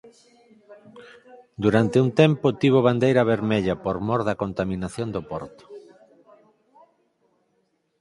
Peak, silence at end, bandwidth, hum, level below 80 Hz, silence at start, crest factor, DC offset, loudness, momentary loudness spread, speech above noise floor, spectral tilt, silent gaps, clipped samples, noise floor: -2 dBFS; 2.2 s; 11.5 kHz; none; -52 dBFS; 0.05 s; 22 dB; under 0.1%; -22 LUFS; 13 LU; 47 dB; -7.5 dB/octave; none; under 0.1%; -70 dBFS